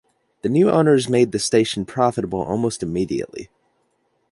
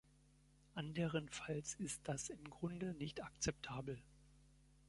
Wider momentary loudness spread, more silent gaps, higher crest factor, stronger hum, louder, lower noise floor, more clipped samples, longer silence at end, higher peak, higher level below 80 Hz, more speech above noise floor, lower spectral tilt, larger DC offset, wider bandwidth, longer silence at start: first, 11 LU vs 8 LU; neither; about the same, 18 dB vs 20 dB; neither; first, -19 LUFS vs -46 LUFS; second, -67 dBFS vs -71 dBFS; neither; first, 0.85 s vs 0.05 s; first, -2 dBFS vs -28 dBFS; first, -52 dBFS vs -66 dBFS; first, 48 dB vs 25 dB; about the same, -5.5 dB/octave vs -4.5 dB/octave; neither; about the same, 11.5 kHz vs 11.5 kHz; second, 0.45 s vs 0.75 s